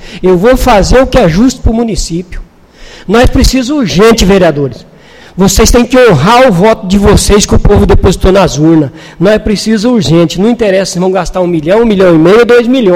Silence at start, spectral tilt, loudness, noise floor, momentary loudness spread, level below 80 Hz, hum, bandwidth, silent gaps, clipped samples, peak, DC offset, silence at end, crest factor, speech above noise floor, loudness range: 0 s; -5.5 dB/octave; -6 LUFS; -34 dBFS; 7 LU; -16 dBFS; none; 17 kHz; none; 3%; 0 dBFS; under 0.1%; 0 s; 6 dB; 28 dB; 3 LU